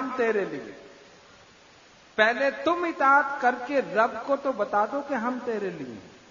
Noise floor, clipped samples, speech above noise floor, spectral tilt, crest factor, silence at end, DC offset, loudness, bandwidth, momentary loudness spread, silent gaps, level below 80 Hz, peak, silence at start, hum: -54 dBFS; under 0.1%; 28 dB; -5 dB/octave; 22 dB; 0.15 s; under 0.1%; -25 LUFS; 7.4 kHz; 15 LU; none; -70 dBFS; -6 dBFS; 0 s; none